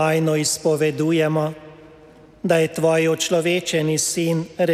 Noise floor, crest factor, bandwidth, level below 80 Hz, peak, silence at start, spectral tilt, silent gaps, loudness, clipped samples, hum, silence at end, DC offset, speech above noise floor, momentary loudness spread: -47 dBFS; 16 dB; 15.5 kHz; -60 dBFS; -4 dBFS; 0 s; -4.5 dB/octave; none; -20 LUFS; under 0.1%; none; 0 s; under 0.1%; 27 dB; 5 LU